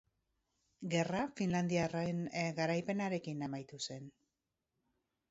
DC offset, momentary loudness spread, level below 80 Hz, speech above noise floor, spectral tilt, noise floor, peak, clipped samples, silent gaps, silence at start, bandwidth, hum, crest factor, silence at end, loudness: under 0.1%; 9 LU; -72 dBFS; 51 dB; -5.5 dB/octave; -88 dBFS; -20 dBFS; under 0.1%; none; 0.8 s; 7.6 kHz; none; 20 dB; 1.2 s; -38 LUFS